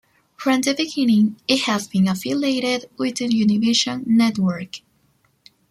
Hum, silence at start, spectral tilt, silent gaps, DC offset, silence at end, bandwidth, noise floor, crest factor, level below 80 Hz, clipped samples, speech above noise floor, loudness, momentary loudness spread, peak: none; 0.4 s; -4.5 dB/octave; none; under 0.1%; 0.9 s; 15 kHz; -63 dBFS; 18 dB; -62 dBFS; under 0.1%; 43 dB; -20 LUFS; 7 LU; -2 dBFS